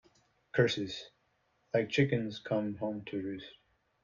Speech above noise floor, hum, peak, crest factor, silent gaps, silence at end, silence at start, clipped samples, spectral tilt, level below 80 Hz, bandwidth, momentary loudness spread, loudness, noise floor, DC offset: 42 dB; none; -14 dBFS; 20 dB; none; 0.5 s; 0.55 s; under 0.1%; -6 dB/octave; -68 dBFS; 7.4 kHz; 15 LU; -33 LUFS; -75 dBFS; under 0.1%